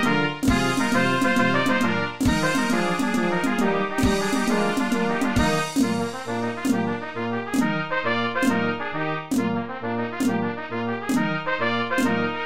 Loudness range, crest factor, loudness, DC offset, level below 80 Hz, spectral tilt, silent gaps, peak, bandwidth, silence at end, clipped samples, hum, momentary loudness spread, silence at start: 4 LU; 16 dB; -23 LUFS; 1%; -42 dBFS; -5 dB/octave; none; -8 dBFS; 16 kHz; 0 s; under 0.1%; none; 7 LU; 0 s